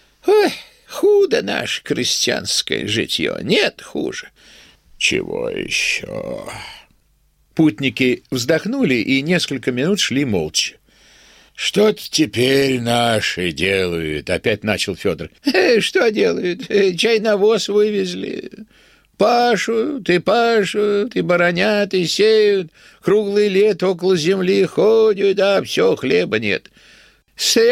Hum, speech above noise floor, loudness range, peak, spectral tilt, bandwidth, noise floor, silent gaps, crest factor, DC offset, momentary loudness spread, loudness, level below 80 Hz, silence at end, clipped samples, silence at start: none; 42 dB; 4 LU; -2 dBFS; -4 dB/octave; 16 kHz; -59 dBFS; none; 16 dB; under 0.1%; 9 LU; -17 LUFS; -52 dBFS; 0 s; under 0.1%; 0.25 s